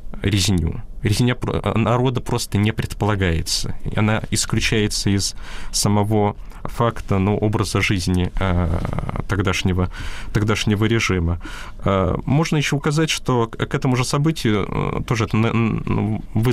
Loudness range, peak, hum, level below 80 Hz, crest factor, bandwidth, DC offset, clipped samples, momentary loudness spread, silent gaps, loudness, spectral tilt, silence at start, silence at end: 1 LU; -8 dBFS; none; -32 dBFS; 12 dB; 15.5 kHz; under 0.1%; under 0.1%; 6 LU; none; -20 LUFS; -5 dB/octave; 0 s; 0 s